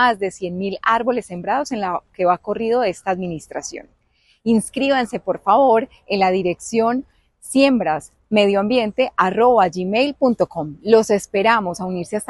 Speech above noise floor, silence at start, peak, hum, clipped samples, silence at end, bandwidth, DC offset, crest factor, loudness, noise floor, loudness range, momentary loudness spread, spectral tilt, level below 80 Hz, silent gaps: 42 dB; 0 s; -2 dBFS; none; under 0.1%; 0.05 s; 12.5 kHz; under 0.1%; 16 dB; -19 LUFS; -60 dBFS; 5 LU; 10 LU; -5 dB/octave; -54 dBFS; none